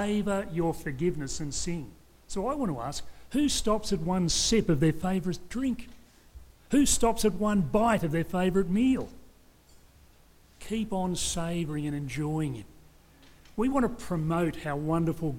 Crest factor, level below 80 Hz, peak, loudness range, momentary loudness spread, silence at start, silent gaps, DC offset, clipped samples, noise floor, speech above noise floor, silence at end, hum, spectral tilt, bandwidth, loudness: 18 dB; -44 dBFS; -12 dBFS; 6 LU; 11 LU; 0 s; none; under 0.1%; under 0.1%; -58 dBFS; 30 dB; 0 s; none; -5 dB/octave; 17 kHz; -29 LUFS